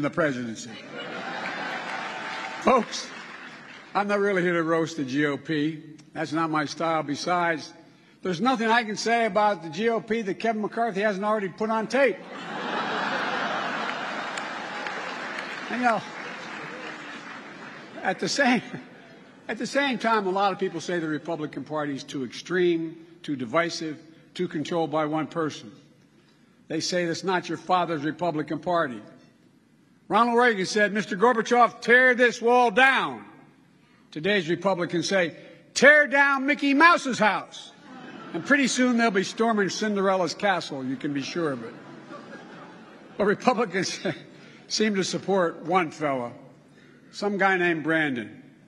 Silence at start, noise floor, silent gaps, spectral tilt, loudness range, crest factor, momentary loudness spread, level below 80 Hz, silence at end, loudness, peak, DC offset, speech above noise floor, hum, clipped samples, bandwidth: 0 s; -59 dBFS; none; -4 dB/octave; 9 LU; 22 dB; 18 LU; -72 dBFS; 0.25 s; -25 LUFS; -4 dBFS; under 0.1%; 35 dB; none; under 0.1%; 11.5 kHz